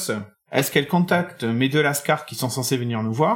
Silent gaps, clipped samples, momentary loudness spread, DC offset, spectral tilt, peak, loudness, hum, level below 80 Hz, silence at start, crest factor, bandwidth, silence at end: none; under 0.1%; 6 LU; under 0.1%; -5 dB/octave; -4 dBFS; -22 LUFS; none; -68 dBFS; 0 s; 18 dB; 18 kHz; 0 s